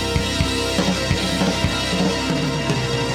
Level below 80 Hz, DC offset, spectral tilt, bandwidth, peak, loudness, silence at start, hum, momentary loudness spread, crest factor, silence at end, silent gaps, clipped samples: -32 dBFS; under 0.1%; -4.5 dB/octave; 16.5 kHz; -4 dBFS; -20 LUFS; 0 s; none; 2 LU; 16 dB; 0 s; none; under 0.1%